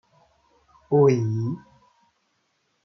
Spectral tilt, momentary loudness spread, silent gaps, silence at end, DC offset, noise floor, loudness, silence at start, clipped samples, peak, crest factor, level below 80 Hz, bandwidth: -9 dB/octave; 13 LU; none; 1.3 s; under 0.1%; -71 dBFS; -22 LUFS; 0.9 s; under 0.1%; -8 dBFS; 18 dB; -68 dBFS; 6.4 kHz